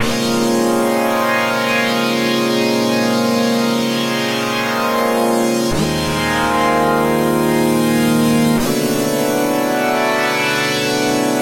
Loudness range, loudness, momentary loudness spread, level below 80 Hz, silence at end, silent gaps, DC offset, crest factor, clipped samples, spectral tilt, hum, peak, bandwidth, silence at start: 1 LU; -16 LUFS; 3 LU; -42 dBFS; 0 s; none; under 0.1%; 14 dB; under 0.1%; -4 dB/octave; none; -2 dBFS; 16 kHz; 0 s